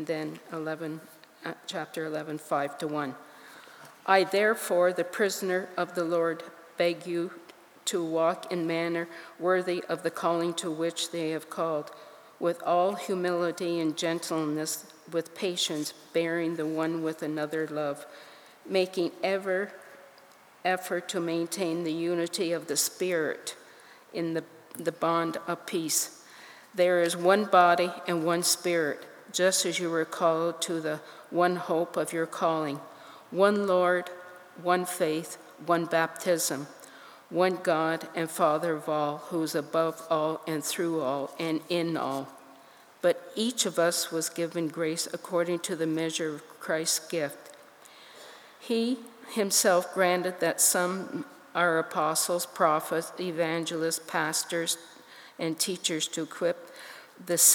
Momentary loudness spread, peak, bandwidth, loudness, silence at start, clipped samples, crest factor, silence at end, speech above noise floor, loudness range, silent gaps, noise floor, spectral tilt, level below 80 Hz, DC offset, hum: 14 LU; -6 dBFS; over 20 kHz; -29 LUFS; 0 s; under 0.1%; 22 dB; 0 s; 27 dB; 6 LU; none; -55 dBFS; -3 dB/octave; -90 dBFS; under 0.1%; none